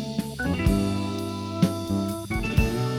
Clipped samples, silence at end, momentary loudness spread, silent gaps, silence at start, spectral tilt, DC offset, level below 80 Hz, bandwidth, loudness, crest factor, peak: under 0.1%; 0 s; 7 LU; none; 0 s; -6.5 dB/octave; under 0.1%; -34 dBFS; 17.5 kHz; -26 LUFS; 18 dB; -8 dBFS